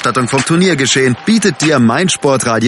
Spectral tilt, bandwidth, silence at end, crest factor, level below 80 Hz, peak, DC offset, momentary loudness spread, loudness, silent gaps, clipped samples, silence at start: -4 dB/octave; 11.5 kHz; 0 s; 12 dB; -50 dBFS; 0 dBFS; under 0.1%; 2 LU; -11 LUFS; none; under 0.1%; 0 s